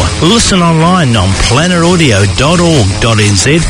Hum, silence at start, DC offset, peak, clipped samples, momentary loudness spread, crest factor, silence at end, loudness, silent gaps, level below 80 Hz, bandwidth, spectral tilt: none; 0 s; under 0.1%; 0 dBFS; 1%; 2 LU; 8 dB; 0 s; -7 LUFS; none; -22 dBFS; 11 kHz; -4.5 dB/octave